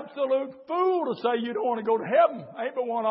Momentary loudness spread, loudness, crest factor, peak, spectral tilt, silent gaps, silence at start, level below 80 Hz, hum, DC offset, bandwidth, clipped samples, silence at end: 8 LU; -26 LUFS; 16 dB; -10 dBFS; -9.5 dB/octave; none; 0 s; -84 dBFS; none; under 0.1%; 5.8 kHz; under 0.1%; 0 s